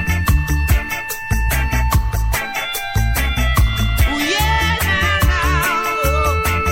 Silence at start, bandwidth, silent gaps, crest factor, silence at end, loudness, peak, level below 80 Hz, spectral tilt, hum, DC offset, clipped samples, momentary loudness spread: 0 s; 17 kHz; none; 14 dB; 0 s; -17 LUFS; -2 dBFS; -20 dBFS; -4 dB/octave; none; under 0.1%; under 0.1%; 5 LU